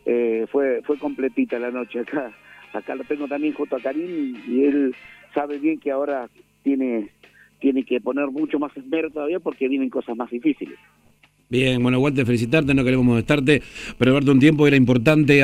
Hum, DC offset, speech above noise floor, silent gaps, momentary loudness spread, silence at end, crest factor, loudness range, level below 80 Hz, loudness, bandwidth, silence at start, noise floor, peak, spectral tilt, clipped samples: 50 Hz at -65 dBFS; under 0.1%; 37 dB; none; 13 LU; 0 s; 20 dB; 8 LU; -50 dBFS; -21 LUFS; 12.5 kHz; 0.05 s; -57 dBFS; 0 dBFS; -7 dB/octave; under 0.1%